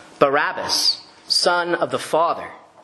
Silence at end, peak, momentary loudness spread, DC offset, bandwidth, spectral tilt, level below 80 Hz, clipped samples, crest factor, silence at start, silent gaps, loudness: 0.25 s; 0 dBFS; 9 LU; under 0.1%; 12.5 kHz; -2 dB/octave; -68 dBFS; under 0.1%; 20 dB; 0 s; none; -19 LUFS